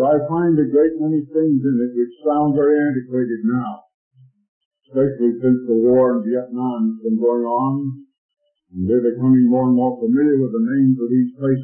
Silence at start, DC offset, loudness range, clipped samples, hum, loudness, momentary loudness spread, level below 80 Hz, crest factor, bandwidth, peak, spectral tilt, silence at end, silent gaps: 0 s; under 0.1%; 3 LU; under 0.1%; none; -18 LUFS; 8 LU; -60 dBFS; 12 dB; 3.2 kHz; -6 dBFS; -14 dB/octave; 0 s; 3.94-4.11 s, 4.48-4.71 s, 8.18-8.29 s